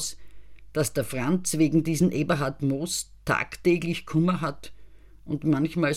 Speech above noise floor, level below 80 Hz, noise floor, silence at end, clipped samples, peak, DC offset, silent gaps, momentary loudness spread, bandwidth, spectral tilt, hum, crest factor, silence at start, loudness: 21 dB; -52 dBFS; -47 dBFS; 0 s; under 0.1%; -10 dBFS; 0.7%; none; 8 LU; 16.5 kHz; -5.5 dB/octave; none; 16 dB; 0 s; -26 LUFS